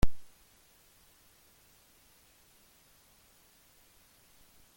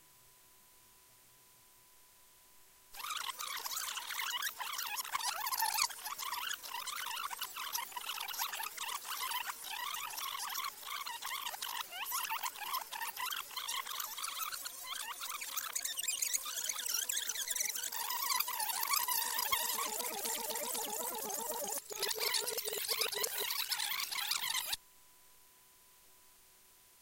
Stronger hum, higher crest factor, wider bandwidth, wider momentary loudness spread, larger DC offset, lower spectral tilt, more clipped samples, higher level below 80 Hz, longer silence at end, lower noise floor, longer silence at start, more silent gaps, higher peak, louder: neither; about the same, 24 dB vs 26 dB; about the same, 17 kHz vs 17 kHz; second, 0 LU vs 8 LU; neither; first, -5.5 dB/octave vs 2 dB/octave; neither; first, -46 dBFS vs -78 dBFS; first, 4.55 s vs 0 s; about the same, -64 dBFS vs -64 dBFS; about the same, 0.05 s vs 0 s; neither; about the same, -12 dBFS vs -14 dBFS; second, -54 LUFS vs -37 LUFS